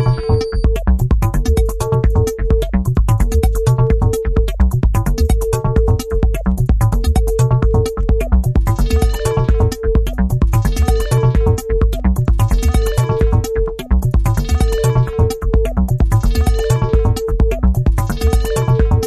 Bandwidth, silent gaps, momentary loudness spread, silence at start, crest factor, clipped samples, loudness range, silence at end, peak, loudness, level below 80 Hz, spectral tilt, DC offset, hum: 14 kHz; none; 3 LU; 0 s; 12 dB; under 0.1%; 1 LU; 0 s; 0 dBFS; -16 LUFS; -16 dBFS; -7 dB/octave; under 0.1%; none